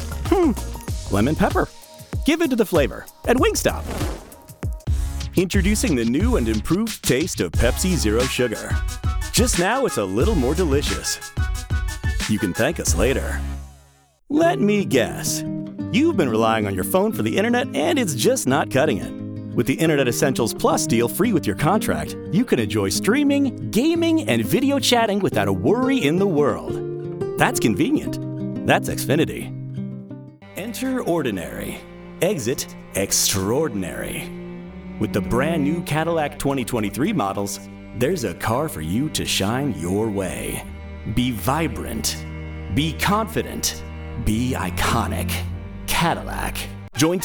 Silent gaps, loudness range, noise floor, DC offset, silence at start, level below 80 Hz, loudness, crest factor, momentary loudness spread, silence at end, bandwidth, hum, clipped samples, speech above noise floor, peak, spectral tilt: none; 4 LU; -54 dBFS; under 0.1%; 0 s; -34 dBFS; -21 LUFS; 20 dB; 11 LU; 0 s; over 20 kHz; none; under 0.1%; 34 dB; -2 dBFS; -4.5 dB/octave